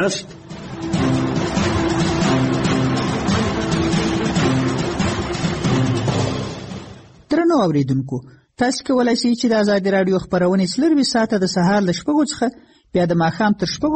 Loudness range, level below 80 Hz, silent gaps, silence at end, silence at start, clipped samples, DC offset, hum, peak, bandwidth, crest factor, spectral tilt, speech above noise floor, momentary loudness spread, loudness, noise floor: 3 LU; -40 dBFS; none; 0 s; 0 s; under 0.1%; under 0.1%; none; -6 dBFS; 8.8 kHz; 12 dB; -5.5 dB/octave; 22 dB; 8 LU; -19 LUFS; -40 dBFS